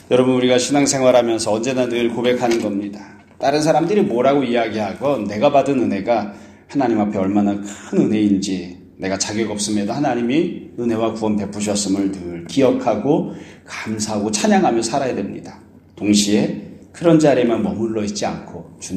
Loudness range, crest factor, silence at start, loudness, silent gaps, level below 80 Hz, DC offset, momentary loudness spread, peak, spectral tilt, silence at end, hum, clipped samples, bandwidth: 3 LU; 18 dB; 0.1 s; -18 LUFS; none; -56 dBFS; under 0.1%; 12 LU; 0 dBFS; -5 dB/octave; 0 s; none; under 0.1%; 14 kHz